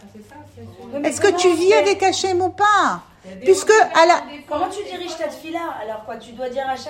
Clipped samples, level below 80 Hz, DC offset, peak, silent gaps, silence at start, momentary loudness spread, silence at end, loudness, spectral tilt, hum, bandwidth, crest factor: under 0.1%; -60 dBFS; under 0.1%; -2 dBFS; none; 0.05 s; 16 LU; 0 s; -18 LUFS; -3 dB/octave; none; 16 kHz; 18 dB